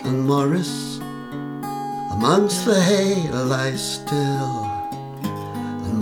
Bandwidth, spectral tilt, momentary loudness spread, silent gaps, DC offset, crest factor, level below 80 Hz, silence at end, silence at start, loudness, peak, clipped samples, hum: 18.5 kHz; -5 dB/octave; 12 LU; none; under 0.1%; 18 dB; -54 dBFS; 0 s; 0 s; -22 LUFS; -4 dBFS; under 0.1%; none